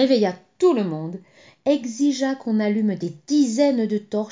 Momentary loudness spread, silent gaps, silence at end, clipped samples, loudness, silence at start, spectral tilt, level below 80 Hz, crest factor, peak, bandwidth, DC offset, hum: 9 LU; none; 0 s; under 0.1%; -22 LUFS; 0 s; -5.5 dB/octave; -72 dBFS; 14 dB; -6 dBFS; 7.6 kHz; under 0.1%; none